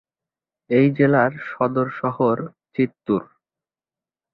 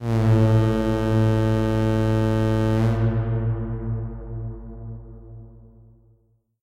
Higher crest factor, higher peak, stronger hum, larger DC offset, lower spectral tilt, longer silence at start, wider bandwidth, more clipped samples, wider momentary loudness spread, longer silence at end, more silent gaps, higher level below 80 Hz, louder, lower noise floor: first, 18 dB vs 12 dB; first, -4 dBFS vs -10 dBFS; neither; neither; first, -11 dB/octave vs -8.5 dB/octave; first, 0.7 s vs 0 s; second, 5.2 kHz vs 8.4 kHz; neither; second, 8 LU vs 19 LU; about the same, 1.1 s vs 1.05 s; neither; second, -62 dBFS vs -34 dBFS; about the same, -21 LUFS vs -22 LUFS; first, under -90 dBFS vs -63 dBFS